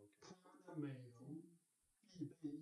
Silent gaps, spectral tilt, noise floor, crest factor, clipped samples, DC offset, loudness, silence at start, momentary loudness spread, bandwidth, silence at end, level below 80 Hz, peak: none; -7.5 dB/octave; -81 dBFS; 18 dB; under 0.1%; under 0.1%; -54 LUFS; 0 s; 13 LU; 11 kHz; 0 s; under -90 dBFS; -36 dBFS